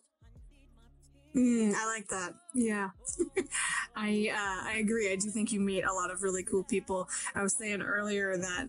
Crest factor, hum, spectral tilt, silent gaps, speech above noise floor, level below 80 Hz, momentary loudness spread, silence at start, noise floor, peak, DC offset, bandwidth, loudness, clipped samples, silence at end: 14 dB; none; -3.5 dB/octave; none; 28 dB; -60 dBFS; 5 LU; 0.25 s; -60 dBFS; -20 dBFS; under 0.1%; 11.5 kHz; -32 LUFS; under 0.1%; 0 s